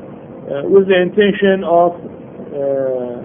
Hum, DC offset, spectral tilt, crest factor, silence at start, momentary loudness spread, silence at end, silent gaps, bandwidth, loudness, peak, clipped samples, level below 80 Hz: none; under 0.1%; -11.5 dB/octave; 14 dB; 0 s; 20 LU; 0 s; none; 3.7 kHz; -14 LUFS; 0 dBFS; under 0.1%; -54 dBFS